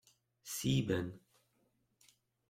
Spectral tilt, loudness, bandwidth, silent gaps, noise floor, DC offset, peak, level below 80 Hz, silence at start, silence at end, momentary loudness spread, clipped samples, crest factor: -5 dB/octave; -37 LUFS; 16.5 kHz; none; -78 dBFS; under 0.1%; -20 dBFS; -66 dBFS; 0.45 s; 1.3 s; 22 LU; under 0.1%; 20 dB